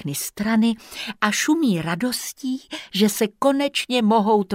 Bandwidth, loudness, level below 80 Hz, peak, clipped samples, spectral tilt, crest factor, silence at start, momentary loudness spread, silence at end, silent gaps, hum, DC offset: 16 kHz; -21 LUFS; -60 dBFS; -2 dBFS; under 0.1%; -4 dB/octave; 18 dB; 0 s; 10 LU; 0 s; none; none; under 0.1%